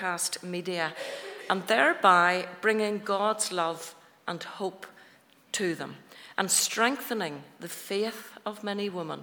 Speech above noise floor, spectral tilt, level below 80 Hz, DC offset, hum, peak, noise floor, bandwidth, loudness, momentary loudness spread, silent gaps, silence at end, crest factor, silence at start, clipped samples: 30 dB; -2.5 dB/octave; -88 dBFS; under 0.1%; none; -6 dBFS; -59 dBFS; over 20 kHz; -28 LUFS; 17 LU; none; 0 s; 24 dB; 0 s; under 0.1%